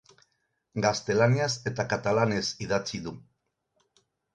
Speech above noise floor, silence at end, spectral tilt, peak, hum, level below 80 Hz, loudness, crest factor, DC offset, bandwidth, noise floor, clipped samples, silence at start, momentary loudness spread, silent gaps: 49 dB; 1.15 s; -5 dB/octave; -8 dBFS; none; -60 dBFS; -27 LUFS; 20 dB; under 0.1%; 10 kHz; -76 dBFS; under 0.1%; 0.75 s; 14 LU; none